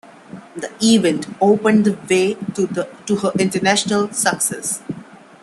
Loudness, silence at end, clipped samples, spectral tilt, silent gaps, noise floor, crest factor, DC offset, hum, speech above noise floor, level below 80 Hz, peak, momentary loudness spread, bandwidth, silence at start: -17 LUFS; 0.25 s; under 0.1%; -4 dB/octave; none; -39 dBFS; 18 dB; under 0.1%; none; 22 dB; -60 dBFS; -2 dBFS; 13 LU; 13 kHz; 0.3 s